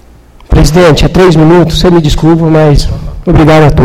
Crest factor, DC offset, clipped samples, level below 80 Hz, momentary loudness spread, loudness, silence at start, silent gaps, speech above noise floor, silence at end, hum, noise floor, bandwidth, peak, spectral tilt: 4 dB; under 0.1%; 6%; -14 dBFS; 7 LU; -5 LUFS; 0.3 s; none; 31 dB; 0 s; none; -34 dBFS; 15 kHz; 0 dBFS; -6.5 dB/octave